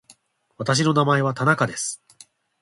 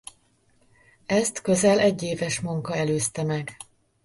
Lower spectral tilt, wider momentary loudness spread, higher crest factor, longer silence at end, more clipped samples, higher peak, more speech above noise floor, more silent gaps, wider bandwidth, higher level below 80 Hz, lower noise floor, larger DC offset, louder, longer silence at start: about the same, -4.5 dB/octave vs -4.5 dB/octave; second, 11 LU vs 24 LU; about the same, 18 dB vs 18 dB; first, 0.65 s vs 0.4 s; neither; first, -4 dBFS vs -8 dBFS; second, 36 dB vs 40 dB; neither; about the same, 11.5 kHz vs 11.5 kHz; about the same, -62 dBFS vs -60 dBFS; second, -56 dBFS vs -63 dBFS; neither; first, -21 LUFS vs -24 LUFS; second, 0.6 s vs 1.1 s